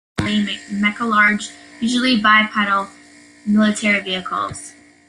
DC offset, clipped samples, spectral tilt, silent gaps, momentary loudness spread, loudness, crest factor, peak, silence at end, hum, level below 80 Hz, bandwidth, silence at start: under 0.1%; under 0.1%; -4 dB/octave; none; 16 LU; -17 LUFS; 18 dB; 0 dBFS; 0.4 s; none; -54 dBFS; 11 kHz; 0.15 s